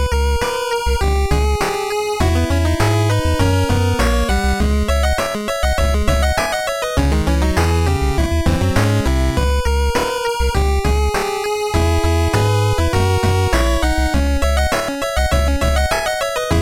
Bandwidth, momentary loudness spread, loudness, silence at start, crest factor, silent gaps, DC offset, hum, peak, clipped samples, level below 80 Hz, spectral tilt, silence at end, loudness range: 16.5 kHz; 3 LU; -17 LUFS; 0 s; 16 dB; none; under 0.1%; none; 0 dBFS; under 0.1%; -20 dBFS; -5.5 dB/octave; 0 s; 1 LU